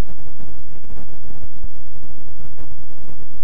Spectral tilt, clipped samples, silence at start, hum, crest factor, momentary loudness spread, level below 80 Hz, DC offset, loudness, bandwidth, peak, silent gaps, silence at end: -8.5 dB/octave; under 0.1%; 0 s; none; 20 dB; 5 LU; -40 dBFS; 50%; -41 LUFS; 9.8 kHz; -4 dBFS; none; 0 s